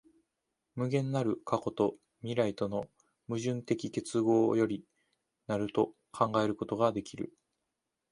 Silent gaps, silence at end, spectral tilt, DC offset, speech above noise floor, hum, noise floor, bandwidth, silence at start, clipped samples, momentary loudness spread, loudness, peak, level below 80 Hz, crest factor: none; 0.85 s; -6.5 dB/octave; under 0.1%; 54 dB; none; -86 dBFS; 11 kHz; 0.75 s; under 0.1%; 13 LU; -32 LUFS; -12 dBFS; -68 dBFS; 22 dB